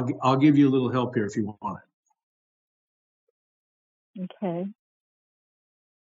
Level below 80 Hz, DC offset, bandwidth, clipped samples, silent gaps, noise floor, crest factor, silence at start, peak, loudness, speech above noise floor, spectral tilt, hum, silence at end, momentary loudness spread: -76 dBFS; under 0.1%; 7.6 kHz; under 0.1%; 1.94-2.03 s, 2.23-4.14 s; under -90 dBFS; 20 dB; 0 s; -8 dBFS; -24 LUFS; over 66 dB; -7 dB/octave; none; 1.3 s; 19 LU